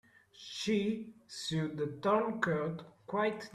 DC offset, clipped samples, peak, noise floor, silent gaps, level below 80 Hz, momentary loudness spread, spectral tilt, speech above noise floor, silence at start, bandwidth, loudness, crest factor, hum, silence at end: under 0.1%; under 0.1%; -18 dBFS; -54 dBFS; none; -72 dBFS; 14 LU; -5.5 dB/octave; 20 dB; 0.35 s; 13.5 kHz; -35 LUFS; 18 dB; none; 0 s